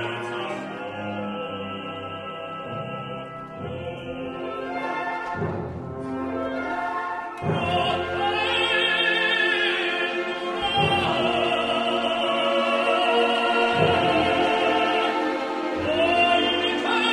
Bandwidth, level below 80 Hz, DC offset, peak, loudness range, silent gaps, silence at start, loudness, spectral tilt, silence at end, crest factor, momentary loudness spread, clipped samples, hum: 12 kHz; -54 dBFS; under 0.1%; -8 dBFS; 11 LU; none; 0 s; -23 LUFS; -5 dB/octave; 0 s; 16 dB; 13 LU; under 0.1%; none